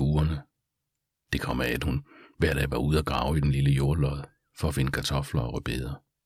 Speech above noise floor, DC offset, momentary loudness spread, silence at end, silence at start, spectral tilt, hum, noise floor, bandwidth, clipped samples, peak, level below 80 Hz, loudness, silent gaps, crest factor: 57 dB; under 0.1%; 9 LU; 0.25 s; 0 s; -6 dB/octave; none; -83 dBFS; 15.5 kHz; under 0.1%; -10 dBFS; -36 dBFS; -28 LUFS; none; 18 dB